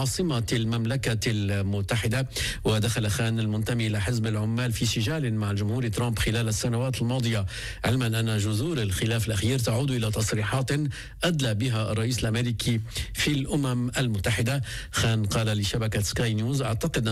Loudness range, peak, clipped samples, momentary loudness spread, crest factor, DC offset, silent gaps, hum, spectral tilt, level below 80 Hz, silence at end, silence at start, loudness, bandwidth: 1 LU; -14 dBFS; under 0.1%; 2 LU; 12 dB; under 0.1%; none; none; -5 dB/octave; -42 dBFS; 0 s; 0 s; -26 LUFS; 15.5 kHz